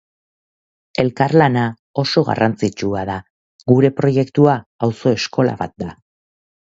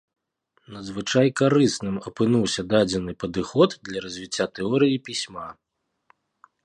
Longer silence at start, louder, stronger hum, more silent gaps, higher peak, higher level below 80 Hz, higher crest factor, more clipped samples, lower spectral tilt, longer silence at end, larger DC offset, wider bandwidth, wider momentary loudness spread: first, 1 s vs 0.7 s; first, -17 LUFS vs -23 LUFS; neither; first, 1.79-1.94 s, 3.30-3.59 s, 4.66-4.79 s vs none; first, 0 dBFS vs -4 dBFS; first, -50 dBFS vs -56 dBFS; about the same, 18 dB vs 20 dB; neither; first, -7 dB/octave vs -5 dB/octave; second, 0.75 s vs 1.15 s; neither; second, 7.8 kHz vs 11 kHz; about the same, 13 LU vs 14 LU